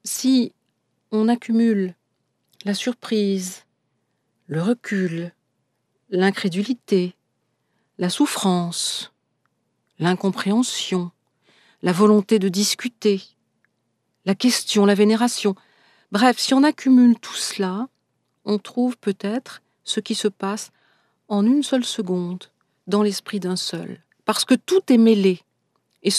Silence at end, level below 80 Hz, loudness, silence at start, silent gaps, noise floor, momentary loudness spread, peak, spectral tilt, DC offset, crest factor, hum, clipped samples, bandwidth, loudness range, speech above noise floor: 0 s; -78 dBFS; -21 LUFS; 0.05 s; none; -72 dBFS; 14 LU; -2 dBFS; -4.5 dB/octave; under 0.1%; 20 dB; none; under 0.1%; 14 kHz; 6 LU; 53 dB